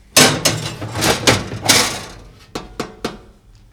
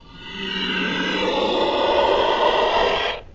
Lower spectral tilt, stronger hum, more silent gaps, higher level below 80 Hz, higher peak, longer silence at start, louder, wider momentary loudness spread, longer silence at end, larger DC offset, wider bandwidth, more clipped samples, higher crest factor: second, -2 dB/octave vs -4 dB/octave; neither; neither; about the same, -40 dBFS vs -44 dBFS; first, 0 dBFS vs -6 dBFS; about the same, 0.15 s vs 0.1 s; first, -15 LUFS vs -20 LUFS; first, 19 LU vs 7 LU; first, 0.5 s vs 0 s; neither; first, over 20 kHz vs 7.8 kHz; neither; about the same, 18 dB vs 16 dB